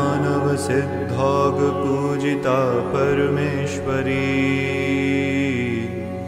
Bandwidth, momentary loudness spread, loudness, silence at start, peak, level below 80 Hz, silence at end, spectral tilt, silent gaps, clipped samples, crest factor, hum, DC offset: 13.5 kHz; 4 LU; -20 LUFS; 0 s; -6 dBFS; -52 dBFS; 0 s; -6.5 dB/octave; none; under 0.1%; 14 dB; none; under 0.1%